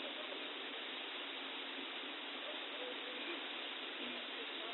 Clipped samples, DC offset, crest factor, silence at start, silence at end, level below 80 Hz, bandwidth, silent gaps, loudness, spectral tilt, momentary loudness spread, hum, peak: under 0.1%; under 0.1%; 14 dB; 0 s; 0 s; under -90 dBFS; 4.3 kHz; none; -44 LUFS; 2.5 dB/octave; 1 LU; none; -32 dBFS